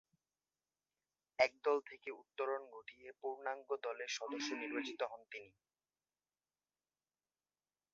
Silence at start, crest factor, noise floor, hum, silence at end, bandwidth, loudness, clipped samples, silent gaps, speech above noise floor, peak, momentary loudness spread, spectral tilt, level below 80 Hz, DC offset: 1.4 s; 26 dB; under -90 dBFS; none; 2.45 s; 7.4 kHz; -41 LUFS; under 0.1%; none; over 48 dB; -18 dBFS; 16 LU; 0.5 dB/octave; -88 dBFS; under 0.1%